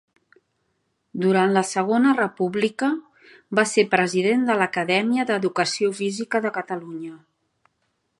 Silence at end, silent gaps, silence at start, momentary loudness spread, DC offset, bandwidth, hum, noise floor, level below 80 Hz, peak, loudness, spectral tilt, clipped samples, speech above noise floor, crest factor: 1.05 s; none; 1.15 s; 12 LU; under 0.1%; 11.5 kHz; none; -72 dBFS; -74 dBFS; -2 dBFS; -22 LUFS; -4.5 dB/octave; under 0.1%; 51 dB; 22 dB